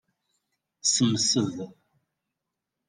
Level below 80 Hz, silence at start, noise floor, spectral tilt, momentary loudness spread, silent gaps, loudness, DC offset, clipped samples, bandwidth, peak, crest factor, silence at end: -74 dBFS; 0.85 s; -85 dBFS; -3.5 dB/octave; 16 LU; none; -24 LUFS; under 0.1%; under 0.1%; 11 kHz; -10 dBFS; 20 dB; 1.15 s